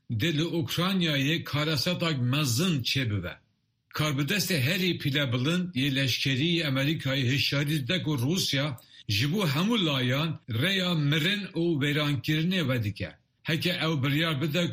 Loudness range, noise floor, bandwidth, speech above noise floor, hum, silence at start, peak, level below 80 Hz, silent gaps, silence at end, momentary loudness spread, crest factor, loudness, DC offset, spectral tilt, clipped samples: 1 LU; -65 dBFS; 15.5 kHz; 38 dB; none; 0.1 s; -12 dBFS; -60 dBFS; none; 0 s; 5 LU; 16 dB; -27 LUFS; under 0.1%; -5 dB/octave; under 0.1%